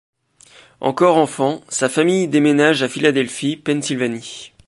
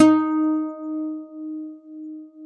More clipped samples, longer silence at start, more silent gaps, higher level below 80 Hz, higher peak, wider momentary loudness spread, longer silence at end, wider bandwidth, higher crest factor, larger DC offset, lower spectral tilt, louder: neither; first, 0.8 s vs 0 s; neither; first, -64 dBFS vs -90 dBFS; about the same, -2 dBFS vs -2 dBFS; second, 9 LU vs 18 LU; first, 0.2 s vs 0 s; first, 11.5 kHz vs 8.4 kHz; second, 16 dB vs 22 dB; neither; about the same, -4.5 dB/octave vs -5.5 dB/octave; first, -17 LUFS vs -24 LUFS